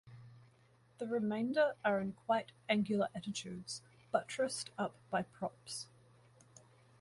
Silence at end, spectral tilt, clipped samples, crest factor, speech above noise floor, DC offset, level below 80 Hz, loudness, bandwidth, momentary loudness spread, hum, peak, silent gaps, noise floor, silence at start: 1.15 s; -4.5 dB/octave; under 0.1%; 22 dB; 31 dB; under 0.1%; -76 dBFS; -38 LUFS; 11.5 kHz; 13 LU; none; -18 dBFS; none; -68 dBFS; 0.05 s